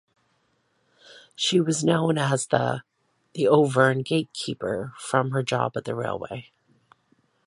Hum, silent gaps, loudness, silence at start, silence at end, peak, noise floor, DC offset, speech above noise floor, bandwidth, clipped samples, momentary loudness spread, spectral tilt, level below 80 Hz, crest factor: none; none; -24 LUFS; 1.1 s; 1.05 s; -4 dBFS; -69 dBFS; under 0.1%; 46 dB; 11.5 kHz; under 0.1%; 13 LU; -5 dB/octave; -64 dBFS; 22 dB